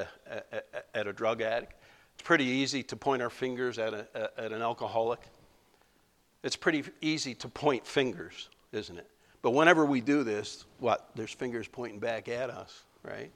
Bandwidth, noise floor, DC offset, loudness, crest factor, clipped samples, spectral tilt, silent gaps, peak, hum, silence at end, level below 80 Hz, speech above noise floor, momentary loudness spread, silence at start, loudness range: 13.5 kHz; -69 dBFS; under 0.1%; -31 LUFS; 28 dB; under 0.1%; -4.5 dB/octave; none; -6 dBFS; none; 0.05 s; -68 dBFS; 37 dB; 16 LU; 0 s; 6 LU